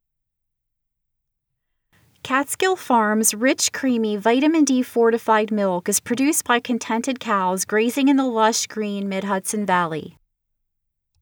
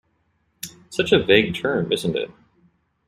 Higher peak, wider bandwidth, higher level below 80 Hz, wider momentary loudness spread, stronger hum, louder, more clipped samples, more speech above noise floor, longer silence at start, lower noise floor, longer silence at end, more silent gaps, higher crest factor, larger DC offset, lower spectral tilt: about the same, -4 dBFS vs -2 dBFS; first, over 20 kHz vs 15 kHz; second, -70 dBFS vs -54 dBFS; second, 6 LU vs 21 LU; neither; about the same, -20 LUFS vs -20 LUFS; neither; first, 58 dB vs 47 dB; first, 2.25 s vs 0.65 s; first, -78 dBFS vs -67 dBFS; first, 1.1 s vs 0.75 s; neither; about the same, 18 dB vs 22 dB; neither; second, -3.5 dB/octave vs -5 dB/octave